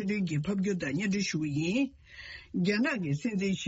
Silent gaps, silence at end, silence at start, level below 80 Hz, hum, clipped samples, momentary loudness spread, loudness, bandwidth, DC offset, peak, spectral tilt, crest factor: none; 0 s; 0 s; -60 dBFS; none; under 0.1%; 9 LU; -31 LUFS; 8 kHz; under 0.1%; -16 dBFS; -5.5 dB/octave; 14 dB